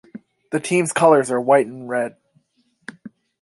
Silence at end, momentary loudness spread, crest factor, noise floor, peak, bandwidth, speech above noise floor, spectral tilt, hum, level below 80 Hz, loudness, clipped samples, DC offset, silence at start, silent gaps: 0.35 s; 24 LU; 18 dB; -65 dBFS; -2 dBFS; 11.5 kHz; 48 dB; -5 dB/octave; none; -70 dBFS; -18 LUFS; under 0.1%; under 0.1%; 0.15 s; none